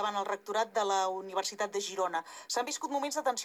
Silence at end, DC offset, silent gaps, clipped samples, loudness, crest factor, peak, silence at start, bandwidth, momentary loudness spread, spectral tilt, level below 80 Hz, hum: 0 s; under 0.1%; none; under 0.1%; -33 LUFS; 16 dB; -18 dBFS; 0 s; 20 kHz; 5 LU; -1 dB/octave; under -90 dBFS; none